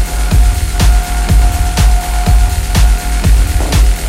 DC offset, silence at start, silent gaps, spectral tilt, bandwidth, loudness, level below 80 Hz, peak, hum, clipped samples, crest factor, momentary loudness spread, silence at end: under 0.1%; 0 s; none; -4.5 dB/octave; 16 kHz; -12 LUFS; -10 dBFS; 0 dBFS; none; under 0.1%; 10 dB; 2 LU; 0 s